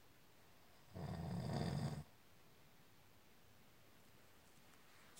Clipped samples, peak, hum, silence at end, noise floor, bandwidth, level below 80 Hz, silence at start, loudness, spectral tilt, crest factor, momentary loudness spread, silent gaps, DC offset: under 0.1%; -28 dBFS; none; 0 s; -69 dBFS; 16 kHz; -68 dBFS; 0.1 s; -47 LUFS; -6.5 dB/octave; 22 dB; 24 LU; none; under 0.1%